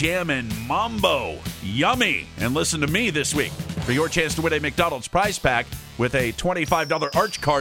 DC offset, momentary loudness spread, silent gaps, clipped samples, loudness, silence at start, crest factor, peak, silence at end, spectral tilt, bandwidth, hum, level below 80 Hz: under 0.1%; 5 LU; none; under 0.1%; -22 LUFS; 0 s; 20 dB; -4 dBFS; 0 s; -4 dB/octave; 18 kHz; none; -42 dBFS